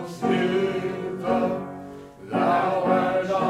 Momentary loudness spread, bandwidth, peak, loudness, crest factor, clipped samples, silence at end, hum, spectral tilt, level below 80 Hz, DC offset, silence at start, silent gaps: 15 LU; 13.5 kHz; -8 dBFS; -24 LUFS; 16 dB; under 0.1%; 0 s; none; -6.5 dB/octave; -60 dBFS; under 0.1%; 0 s; none